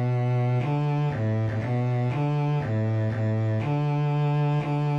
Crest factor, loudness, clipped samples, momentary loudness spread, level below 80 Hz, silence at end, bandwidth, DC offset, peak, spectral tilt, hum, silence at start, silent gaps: 8 dB; -25 LUFS; under 0.1%; 2 LU; -56 dBFS; 0 s; 6.2 kHz; 0.1%; -16 dBFS; -9.5 dB/octave; none; 0 s; none